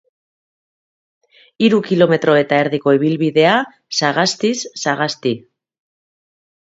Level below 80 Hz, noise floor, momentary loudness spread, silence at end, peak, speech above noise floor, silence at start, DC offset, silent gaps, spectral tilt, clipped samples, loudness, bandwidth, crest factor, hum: -64 dBFS; under -90 dBFS; 7 LU; 1.25 s; 0 dBFS; over 75 dB; 1.6 s; under 0.1%; none; -4.5 dB/octave; under 0.1%; -16 LUFS; 8 kHz; 18 dB; none